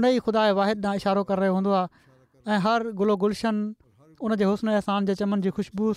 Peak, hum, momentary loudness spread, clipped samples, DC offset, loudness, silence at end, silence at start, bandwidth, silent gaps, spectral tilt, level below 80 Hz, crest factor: -12 dBFS; none; 7 LU; under 0.1%; under 0.1%; -25 LUFS; 0 s; 0 s; 11.5 kHz; none; -7 dB/octave; -60 dBFS; 12 dB